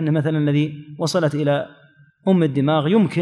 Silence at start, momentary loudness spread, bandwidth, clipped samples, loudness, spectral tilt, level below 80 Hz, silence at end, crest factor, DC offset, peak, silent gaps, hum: 0 s; 9 LU; 12 kHz; under 0.1%; -20 LUFS; -7 dB/octave; -68 dBFS; 0 s; 14 dB; under 0.1%; -4 dBFS; none; none